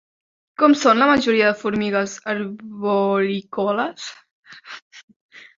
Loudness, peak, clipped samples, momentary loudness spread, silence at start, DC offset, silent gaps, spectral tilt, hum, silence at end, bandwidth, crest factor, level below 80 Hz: -19 LUFS; -2 dBFS; under 0.1%; 23 LU; 0.6 s; under 0.1%; 4.31-4.43 s, 4.82-4.91 s, 5.03-5.08 s, 5.16-5.29 s; -5 dB/octave; none; 0.2 s; 7.6 kHz; 18 dB; -60 dBFS